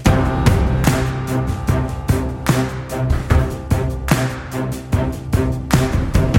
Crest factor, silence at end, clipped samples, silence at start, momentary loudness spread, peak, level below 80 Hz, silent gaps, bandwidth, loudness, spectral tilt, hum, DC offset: 16 dB; 0 s; under 0.1%; 0 s; 5 LU; 0 dBFS; -24 dBFS; none; 17 kHz; -19 LUFS; -6.5 dB/octave; none; under 0.1%